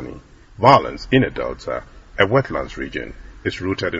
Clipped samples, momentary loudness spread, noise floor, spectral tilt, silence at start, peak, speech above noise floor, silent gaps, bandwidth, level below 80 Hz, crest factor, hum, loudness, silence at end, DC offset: under 0.1%; 17 LU; -40 dBFS; -6.5 dB/octave; 0 s; 0 dBFS; 21 dB; none; 7.8 kHz; -40 dBFS; 20 dB; none; -19 LUFS; 0 s; under 0.1%